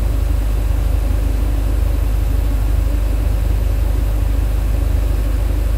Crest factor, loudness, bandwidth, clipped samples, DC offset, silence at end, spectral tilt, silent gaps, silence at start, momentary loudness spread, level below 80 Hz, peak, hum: 10 dB; -19 LUFS; 16 kHz; under 0.1%; under 0.1%; 0 s; -7 dB/octave; none; 0 s; 1 LU; -16 dBFS; -6 dBFS; none